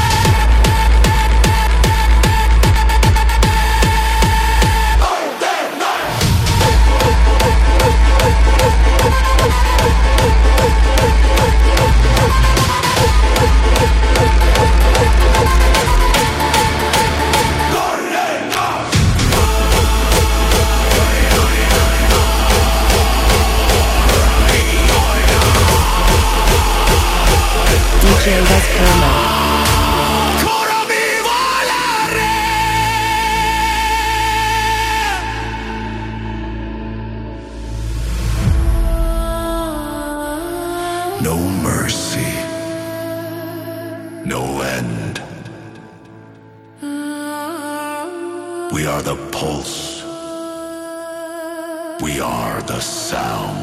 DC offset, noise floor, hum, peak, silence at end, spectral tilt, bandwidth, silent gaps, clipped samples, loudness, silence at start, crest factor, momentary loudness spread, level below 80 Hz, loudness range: under 0.1%; -41 dBFS; none; 0 dBFS; 0 s; -4 dB/octave; 16 kHz; none; under 0.1%; -14 LUFS; 0 s; 14 dB; 13 LU; -16 dBFS; 11 LU